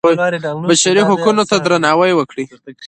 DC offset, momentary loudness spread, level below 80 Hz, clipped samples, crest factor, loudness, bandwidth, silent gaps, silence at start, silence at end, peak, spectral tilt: under 0.1%; 11 LU; -58 dBFS; under 0.1%; 14 dB; -13 LUFS; 11 kHz; none; 0.05 s; 0 s; 0 dBFS; -4 dB/octave